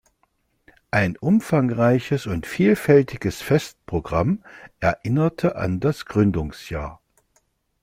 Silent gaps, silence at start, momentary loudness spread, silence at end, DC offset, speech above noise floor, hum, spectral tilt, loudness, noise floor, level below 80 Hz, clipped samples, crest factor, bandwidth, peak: none; 0.95 s; 11 LU; 0.9 s; under 0.1%; 47 dB; none; -7.5 dB/octave; -22 LUFS; -68 dBFS; -46 dBFS; under 0.1%; 18 dB; 16 kHz; -4 dBFS